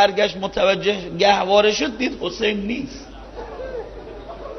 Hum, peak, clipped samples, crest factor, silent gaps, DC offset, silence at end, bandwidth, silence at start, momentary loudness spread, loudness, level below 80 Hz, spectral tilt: none; -2 dBFS; under 0.1%; 20 dB; none; under 0.1%; 0 s; 6.6 kHz; 0 s; 20 LU; -19 LUFS; -44 dBFS; -4 dB/octave